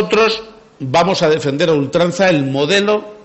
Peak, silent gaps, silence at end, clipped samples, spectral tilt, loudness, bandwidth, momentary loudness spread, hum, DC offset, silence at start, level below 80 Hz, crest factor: -4 dBFS; none; 0.1 s; under 0.1%; -5 dB/octave; -14 LUFS; 8.4 kHz; 4 LU; none; under 0.1%; 0 s; -50 dBFS; 12 dB